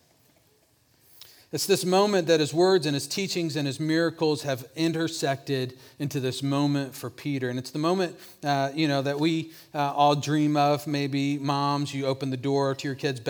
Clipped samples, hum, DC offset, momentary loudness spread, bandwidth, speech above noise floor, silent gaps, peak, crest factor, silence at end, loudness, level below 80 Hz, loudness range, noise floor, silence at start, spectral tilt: under 0.1%; none; under 0.1%; 9 LU; over 20 kHz; 38 dB; none; -8 dBFS; 18 dB; 0 s; -26 LUFS; -74 dBFS; 4 LU; -64 dBFS; 1.55 s; -5 dB/octave